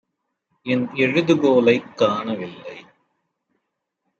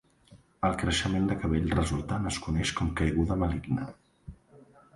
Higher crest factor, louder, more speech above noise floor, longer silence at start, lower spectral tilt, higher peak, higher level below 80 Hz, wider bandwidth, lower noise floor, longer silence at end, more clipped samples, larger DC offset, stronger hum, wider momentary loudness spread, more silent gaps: about the same, 18 dB vs 18 dB; first, -19 LUFS vs -29 LUFS; first, 58 dB vs 30 dB; first, 0.65 s vs 0.3 s; about the same, -6.5 dB/octave vs -5.5 dB/octave; first, -4 dBFS vs -12 dBFS; second, -68 dBFS vs -40 dBFS; second, 7.6 kHz vs 11.5 kHz; first, -77 dBFS vs -58 dBFS; first, 1.4 s vs 0.4 s; neither; neither; neither; first, 19 LU vs 6 LU; neither